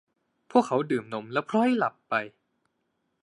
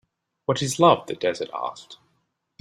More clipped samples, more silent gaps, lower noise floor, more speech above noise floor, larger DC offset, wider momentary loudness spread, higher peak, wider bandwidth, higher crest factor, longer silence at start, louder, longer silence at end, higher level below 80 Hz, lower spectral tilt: neither; neither; first, -77 dBFS vs -72 dBFS; about the same, 51 dB vs 49 dB; neither; second, 7 LU vs 15 LU; second, -6 dBFS vs -2 dBFS; second, 11 kHz vs 15.5 kHz; about the same, 22 dB vs 22 dB; about the same, 0.55 s vs 0.5 s; second, -27 LUFS vs -23 LUFS; first, 0.95 s vs 0.65 s; second, -78 dBFS vs -64 dBFS; first, -6 dB/octave vs -4.5 dB/octave